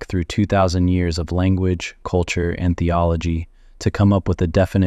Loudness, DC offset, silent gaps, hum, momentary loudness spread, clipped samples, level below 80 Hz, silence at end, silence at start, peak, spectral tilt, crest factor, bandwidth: -20 LUFS; under 0.1%; none; none; 8 LU; under 0.1%; -32 dBFS; 0 s; 0 s; -4 dBFS; -7 dB/octave; 14 dB; 9.4 kHz